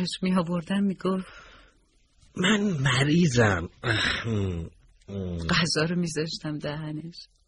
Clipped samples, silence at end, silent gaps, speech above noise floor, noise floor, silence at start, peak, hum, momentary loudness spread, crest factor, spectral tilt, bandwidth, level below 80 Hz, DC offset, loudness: under 0.1%; 0.25 s; none; 37 dB; -63 dBFS; 0 s; -8 dBFS; none; 15 LU; 18 dB; -5 dB/octave; 11.5 kHz; -48 dBFS; under 0.1%; -26 LUFS